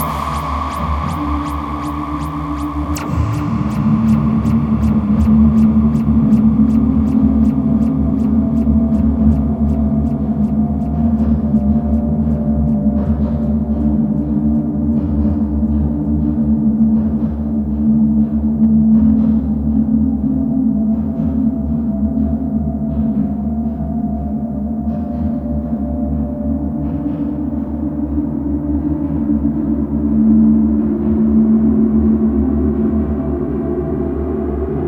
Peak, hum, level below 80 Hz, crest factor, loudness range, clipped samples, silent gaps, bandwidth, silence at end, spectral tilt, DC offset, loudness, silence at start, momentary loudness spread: 0 dBFS; none; -24 dBFS; 14 dB; 7 LU; under 0.1%; none; 8.2 kHz; 0 s; -9.5 dB/octave; under 0.1%; -16 LUFS; 0 s; 8 LU